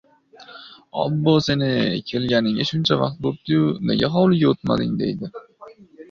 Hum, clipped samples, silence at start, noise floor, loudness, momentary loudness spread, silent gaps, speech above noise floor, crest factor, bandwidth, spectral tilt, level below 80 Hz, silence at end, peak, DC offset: none; under 0.1%; 0.4 s; -47 dBFS; -20 LUFS; 14 LU; none; 27 dB; 18 dB; 7.2 kHz; -7 dB/octave; -52 dBFS; 0.05 s; -4 dBFS; under 0.1%